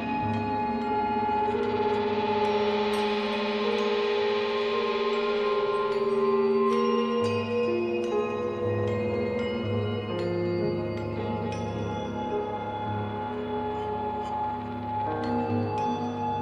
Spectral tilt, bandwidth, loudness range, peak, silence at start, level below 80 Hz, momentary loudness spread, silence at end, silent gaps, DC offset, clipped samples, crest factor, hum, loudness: -7 dB/octave; 9.6 kHz; 6 LU; -14 dBFS; 0 s; -56 dBFS; 6 LU; 0 s; none; under 0.1%; under 0.1%; 14 dB; none; -28 LUFS